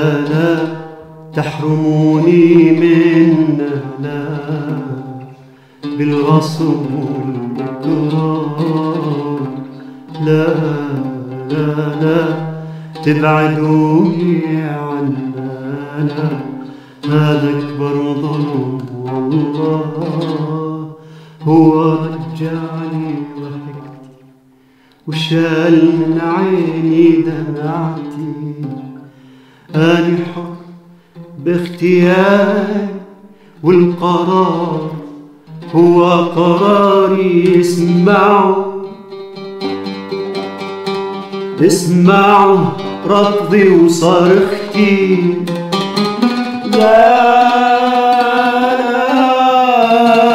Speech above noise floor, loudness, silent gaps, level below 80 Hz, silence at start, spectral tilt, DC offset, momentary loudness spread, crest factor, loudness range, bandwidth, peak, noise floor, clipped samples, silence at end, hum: 37 dB; -13 LUFS; none; -58 dBFS; 0 s; -7 dB/octave; under 0.1%; 15 LU; 12 dB; 8 LU; 14 kHz; 0 dBFS; -48 dBFS; under 0.1%; 0 s; none